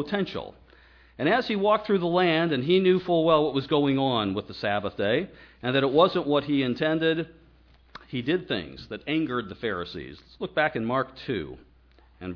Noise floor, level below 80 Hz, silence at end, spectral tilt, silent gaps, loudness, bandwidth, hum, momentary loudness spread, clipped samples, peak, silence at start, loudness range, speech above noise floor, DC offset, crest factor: -57 dBFS; -56 dBFS; 0 s; -8 dB/octave; none; -25 LUFS; 5.4 kHz; none; 15 LU; under 0.1%; -6 dBFS; 0 s; 7 LU; 32 dB; under 0.1%; 20 dB